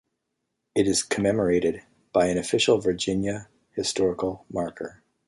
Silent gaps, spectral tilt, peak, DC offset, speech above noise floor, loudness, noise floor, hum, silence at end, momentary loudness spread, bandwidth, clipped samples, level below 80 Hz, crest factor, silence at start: none; -4 dB/octave; -8 dBFS; under 0.1%; 55 dB; -25 LUFS; -80 dBFS; none; 0.35 s; 13 LU; 11.5 kHz; under 0.1%; -54 dBFS; 18 dB; 0.75 s